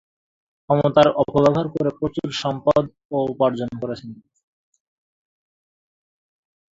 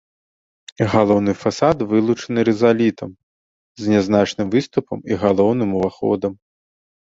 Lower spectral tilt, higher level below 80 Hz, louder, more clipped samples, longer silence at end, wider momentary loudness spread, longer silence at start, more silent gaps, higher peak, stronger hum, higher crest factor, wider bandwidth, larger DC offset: about the same, -7 dB/octave vs -6.5 dB/octave; about the same, -54 dBFS vs -50 dBFS; about the same, -20 LUFS vs -18 LUFS; neither; first, 2.55 s vs 0.7 s; first, 12 LU vs 8 LU; about the same, 0.7 s vs 0.8 s; second, 3.05-3.09 s vs 3.23-3.75 s; about the same, -2 dBFS vs -2 dBFS; neither; about the same, 22 dB vs 18 dB; about the same, 7.8 kHz vs 7.8 kHz; neither